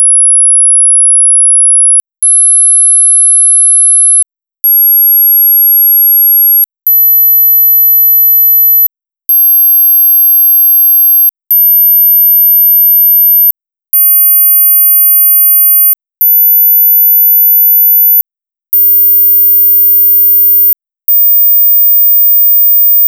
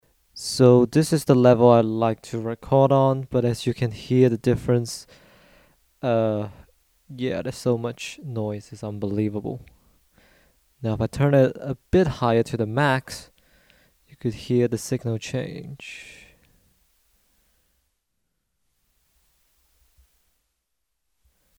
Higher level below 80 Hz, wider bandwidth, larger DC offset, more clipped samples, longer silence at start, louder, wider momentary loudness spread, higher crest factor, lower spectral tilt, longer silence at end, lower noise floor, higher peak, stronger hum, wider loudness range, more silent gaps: second, -82 dBFS vs -50 dBFS; first, over 20 kHz vs 16 kHz; neither; neither; second, 0 s vs 0.35 s; first, -2 LUFS vs -22 LUFS; second, 4 LU vs 18 LU; second, 4 dB vs 22 dB; second, 5.5 dB/octave vs -6.5 dB/octave; second, 0 s vs 5.5 s; first, -87 dBFS vs -79 dBFS; about the same, -2 dBFS vs -2 dBFS; neither; second, 1 LU vs 11 LU; neither